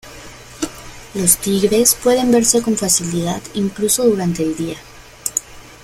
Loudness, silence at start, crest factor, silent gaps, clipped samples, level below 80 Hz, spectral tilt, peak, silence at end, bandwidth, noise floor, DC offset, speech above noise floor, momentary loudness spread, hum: -16 LUFS; 0.05 s; 18 dB; none; under 0.1%; -44 dBFS; -3.5 dB/octave; 0 dBFS; 0.1 s; 16.5 kHz; -37 dBFS; under 0.1%; 21 dB; 16 LU; none